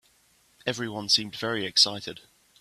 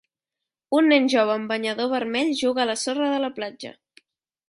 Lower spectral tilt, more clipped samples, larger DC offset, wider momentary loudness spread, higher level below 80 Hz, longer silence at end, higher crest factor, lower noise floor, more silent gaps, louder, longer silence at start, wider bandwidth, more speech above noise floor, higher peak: about the same, -2 dB/octave vs -3 dB/octave; neither; neither; about the same, 14 LU vs 14 LU; about the same, -68 dBFS vs -70 dBFS; second, 0.4 s vs 0.8 s; first, 24 dB vs 16 dB; second, -64 dBFS vs -87 dBFS; neither; about the same, -24 LUFS vs -22 LUFS; about the same, 0.65 s vs 0.7 s; first, 15 kHz vs 11.5 kHz; second, 36 dB vs 65 dB; first, -4 dBFS vs -8 dBFS